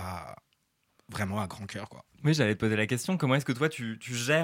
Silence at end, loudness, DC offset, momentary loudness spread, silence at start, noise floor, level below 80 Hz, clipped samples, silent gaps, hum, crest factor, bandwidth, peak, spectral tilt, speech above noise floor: 0 s; -30 LUFS; under 0.1%; 15 LU; 0 s; -74 dBFS; -64 dBFS; under 0.1%; none; none; 20 dB; 16.5 kHz; -10 dBFS; -5.5 dB/octave; 45 dB